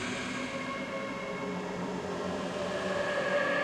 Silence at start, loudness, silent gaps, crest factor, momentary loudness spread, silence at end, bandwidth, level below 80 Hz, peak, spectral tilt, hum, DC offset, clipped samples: 0 s; -34 LUFS; none; 14 dB; 6 LU; 0 s; 13 kHz; -62 dBFS; -20 dBFS; -4.5 dB/octave; none; under 0.1%; under 0.1%